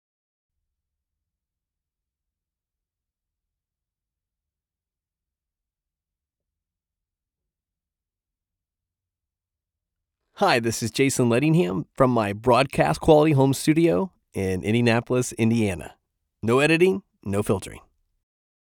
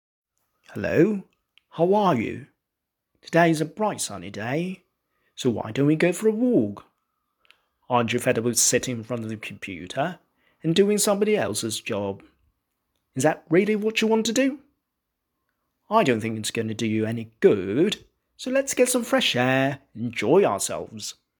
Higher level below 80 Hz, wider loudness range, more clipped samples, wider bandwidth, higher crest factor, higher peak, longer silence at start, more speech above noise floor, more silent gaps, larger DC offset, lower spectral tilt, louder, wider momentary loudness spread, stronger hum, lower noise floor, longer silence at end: first, -54 dBFS vs -64 dBFS; first, 6 LU vs 3 LU; neither; about the same, 18.5 kHz vs 19 kHz; about the same, 22 dB vs 20 dB; about the same, -4 dBFS vs -4 dBFS; first, 10.4 s vs 0.7 s; first, over 69 dB vs 60 dB; neither; neither; first, -5.5 dB/octave vs -4 dB/octave; about the same, -22 LUFS vs -23 LUFS; second, 10 LU vs 13 LU; neither; first, under -90 dBFS vs -83 dBFS; first, 0.95 s vs 0.3 s